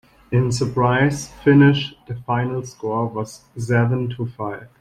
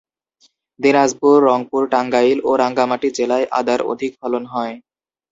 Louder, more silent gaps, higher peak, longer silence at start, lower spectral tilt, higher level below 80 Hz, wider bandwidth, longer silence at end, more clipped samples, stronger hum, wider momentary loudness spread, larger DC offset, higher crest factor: second, -20 LUFS vs -17 LUFS; neither; about the same, -4 dBFS vs -2 dBFS; second, 0.3 s vs 0.8 s; first, -6.5 dB/octave vs -4.5 dB/octave; first, -50 dBFS vs -62 dBFS; first, 12 kHz vs 7.8 kHz; second, 0.15 s vs 0.55 s; neither; neither; first, 16 LU vs 10 LU; neither; about the same, 16 dB vs 16 dB